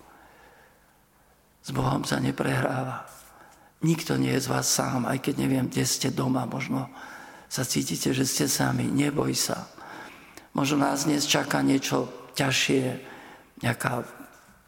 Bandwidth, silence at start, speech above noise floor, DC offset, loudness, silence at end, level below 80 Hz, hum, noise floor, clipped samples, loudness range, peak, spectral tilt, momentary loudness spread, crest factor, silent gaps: 17 kHz; 1.65 s; 35 dB; under 0.1%; -26 LUFS; 0.4 s; -58 dBFS; none; -61 dBFS; under 0.1%; 4 LU; -6 dBFS; -4 dB/octave; 18 LU; 20 dB; none